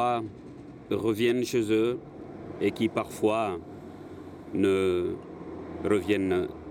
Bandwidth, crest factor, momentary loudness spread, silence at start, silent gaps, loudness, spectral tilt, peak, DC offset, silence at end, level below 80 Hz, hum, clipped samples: 16.5 kHz; 16 dB; 18 LU; 0 s; none; -28 LUFS; -6 dB/octave; -12 dBFS; under 0.1%; 0 s; -62 dBFS; none; under 0.1%